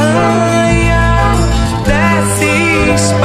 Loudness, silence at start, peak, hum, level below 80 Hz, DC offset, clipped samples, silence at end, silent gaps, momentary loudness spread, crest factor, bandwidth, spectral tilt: -11 LUFS; 0 s; 0 dBFS; none; -18 dBFS; under 0.1%; under 0.1%; 0 s; none; 3 LU; 10 dB; 15 kHz; -5 dB/octave